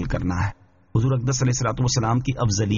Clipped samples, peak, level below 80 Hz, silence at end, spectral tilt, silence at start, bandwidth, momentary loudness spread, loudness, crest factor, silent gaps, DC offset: under 0.1%; -8 dBFS; -38 dBFS; 0 s; -6.5 dB/octave; 0 s; 7.4 kHz; 5 LU; -23 LUFS; 14 dB; none; under 0.1%